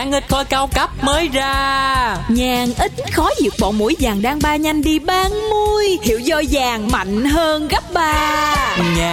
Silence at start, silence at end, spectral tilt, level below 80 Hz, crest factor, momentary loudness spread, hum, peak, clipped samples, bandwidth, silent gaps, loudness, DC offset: 0 s; 0 s; -4 dB/octave; -28 dBFS; 12 dB; 2 LU; none; -4 dBFS; under 0.1%; 17 kHz; none; -16 LUFS; under 0.1%